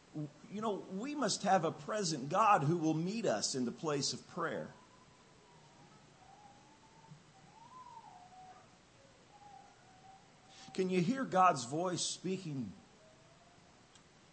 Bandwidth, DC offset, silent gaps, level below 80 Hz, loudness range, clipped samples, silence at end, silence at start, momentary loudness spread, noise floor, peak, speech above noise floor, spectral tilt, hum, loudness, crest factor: 8.8 kHz; under 0.1%; none; -80 dBFS; 24 LU; under 0.1%; 1.55 s; 0.15 s; 26 LU; -63 dBFS; -16 dBFS; 28 dB; -4.5 dB/octave; none; -35 LUFS; 22 dB